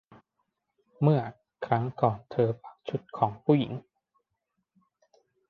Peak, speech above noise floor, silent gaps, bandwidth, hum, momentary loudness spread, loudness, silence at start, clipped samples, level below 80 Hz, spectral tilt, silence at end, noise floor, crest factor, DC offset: -8 dBFS; 54 dB; none; 5 kHz; none; 13 LU; -28 LUFS; 1 s; under 0.1%; -66 dBFS; -10 dB/octave; 1.7 s; -81 dBFS; 22 dB; under 0.1%